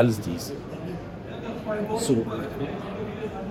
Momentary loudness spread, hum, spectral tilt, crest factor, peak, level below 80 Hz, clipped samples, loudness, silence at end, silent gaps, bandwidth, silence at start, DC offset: 11 LU; none; -6 dB/octave; 22 dB; -6 dBFS; -50 dBFS; under 0.1%; -30 LUFS; 0 s; none; 17 kHz; 0 s; under 0.1%